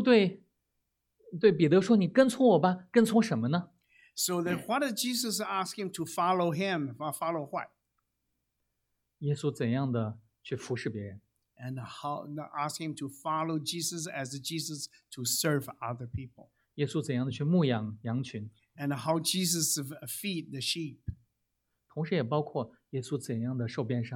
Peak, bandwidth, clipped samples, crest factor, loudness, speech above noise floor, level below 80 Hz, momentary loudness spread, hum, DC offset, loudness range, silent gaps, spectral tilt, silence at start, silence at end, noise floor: -10 dBFS; 17.5 kHz; under 0.1%; 22 dB; -31 LUFS; 51 dB; -66 dBFS; 15 LU; none; under 0.1%; 10 LU; none; -5 dB/octave; 0 s; 0 s; -82 dBFS